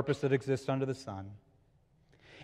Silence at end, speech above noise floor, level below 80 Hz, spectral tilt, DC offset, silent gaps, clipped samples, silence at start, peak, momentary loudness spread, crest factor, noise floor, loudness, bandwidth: 0 s; 34 dB; -70 dBFS; -7 dB/octave; under 0.1%; none; under 0.1%; 0 s; -16 dBFS; 14 LU; 20 dB; -68 dBFS; -34 LUFS; 11.5 kHz